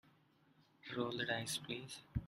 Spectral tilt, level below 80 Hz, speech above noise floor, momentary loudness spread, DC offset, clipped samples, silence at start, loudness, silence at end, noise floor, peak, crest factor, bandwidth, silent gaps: -3.5 dB/octave; -60 dBFS; 29 dB; 9 LU; under 0.1%; under 0.1%; 0.85 s; -42 LUFS; 0 s; -72 dBFS; -22 dBFS; 22 dB; 14.5 kHz; none